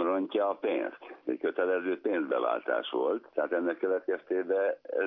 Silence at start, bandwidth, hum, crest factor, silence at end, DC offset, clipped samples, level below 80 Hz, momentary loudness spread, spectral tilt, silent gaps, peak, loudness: 0 s; 3.9 kHz; none; 16 dB; 0 s; under 0.1%; under 0.1%; -88 dBFS; 4 LU; -2 dB/octave; none; -14 dBFS; -31 LUFS